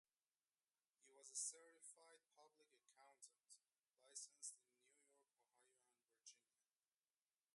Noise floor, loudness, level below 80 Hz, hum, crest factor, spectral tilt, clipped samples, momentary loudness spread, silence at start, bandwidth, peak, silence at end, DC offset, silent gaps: under -90 dBFS; -55 LUFS; under -90 dBFS; none; 28 dB; 3 dB/octave; under 0.1%; 18 LU; 1 s; 11.5 kHz; -36 dBFS; 1.15 s; under 0.1%; none